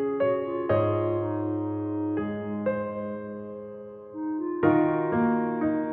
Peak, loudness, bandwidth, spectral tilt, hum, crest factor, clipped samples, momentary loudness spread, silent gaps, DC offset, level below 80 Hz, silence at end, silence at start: -8 dBFS; -27 LUFS; 4 kHz; -8 dB/octave; none; 18 dB; under 0.1%; 14 LU; none; under 0.1%; -60 dBFS; 0 s; 0 s